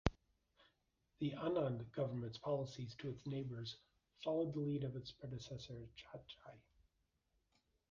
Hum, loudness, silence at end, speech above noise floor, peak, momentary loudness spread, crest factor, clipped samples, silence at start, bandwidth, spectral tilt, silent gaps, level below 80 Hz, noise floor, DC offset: none; -45 LUFS; 1.3 s; 40 dB; -16 dBFS; 15 LU; 30 dB; under 0.1%; 0.05 s; 7.2 kHz; -6.5 dB/octave; none; -60 dBFS; -84 dBFS; under 0.1%